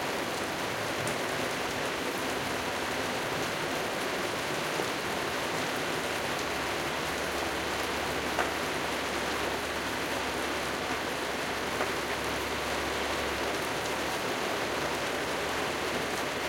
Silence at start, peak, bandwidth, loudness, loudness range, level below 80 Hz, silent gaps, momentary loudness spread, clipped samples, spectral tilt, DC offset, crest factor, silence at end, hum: 0 s; -14 dBFS; 17 kHz; -31 LUFS; 0 LU; -54 dBFS; none; 1 LU; under 0.1%; -3 dB/octave; under 0.1%; 18 dB; 0 s; none